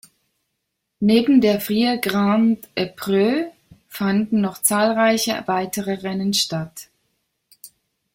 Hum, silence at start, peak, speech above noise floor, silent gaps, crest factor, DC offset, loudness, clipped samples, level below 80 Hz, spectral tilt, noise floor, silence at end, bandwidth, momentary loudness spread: none; 1 s; -2 dBFS; 58 dB; none; 18 dB; under 0.1%; -19 LUFS; under 0.1%; -60 dBFS; -4.5 dB/octave; -77 dBFS; 0.45 s; 16.5 kHz; 9 LU